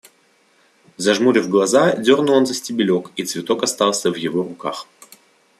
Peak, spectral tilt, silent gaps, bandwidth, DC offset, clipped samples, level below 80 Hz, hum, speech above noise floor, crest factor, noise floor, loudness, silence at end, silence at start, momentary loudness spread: -2 dBFS; -4 dB/octave; none; 14 kHz; under 0.1%; under 0.1%; -66 dBFS; none; 40 dB; 18 dB; -58 dBFS; -18 LUFS; 0.75 s; 1 s; 11 LU